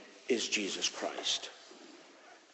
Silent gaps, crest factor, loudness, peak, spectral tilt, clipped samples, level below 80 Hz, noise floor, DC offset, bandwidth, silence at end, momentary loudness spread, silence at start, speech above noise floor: none; 20 dB; -34 LUFS; -18 dBFS; -1 dB/octave; under 0.1%; -78 dBFS; -58 dBFS; under 0.1%; 8.6 kHz; 0.15 s; 22 LU; 0 s; 23 dB